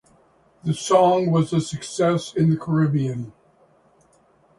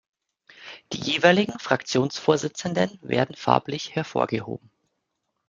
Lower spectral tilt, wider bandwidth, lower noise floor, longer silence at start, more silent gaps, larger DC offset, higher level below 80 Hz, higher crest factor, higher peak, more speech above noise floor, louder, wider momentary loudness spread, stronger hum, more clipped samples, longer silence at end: first, -6.5 dB/octave vs -5 dB/octave; first, 11.5 kHz vs 9.4 kHz; second, -58 dBFS vs -78 dBFS; about the same, 0.65 s vs 0.6 s; neither; neither; first, -58 dBFS vs -64 dBFS; second, 18 dB vs 24 dB; about the same, -4 dBFS vs -2 dBFS; second, 38 dB vs 54 dB; first, -21 LUFS vs -24 LUFS; second, 12 LU vs 17 LU; neither; neither; first, 1.25 s vs 0.9 s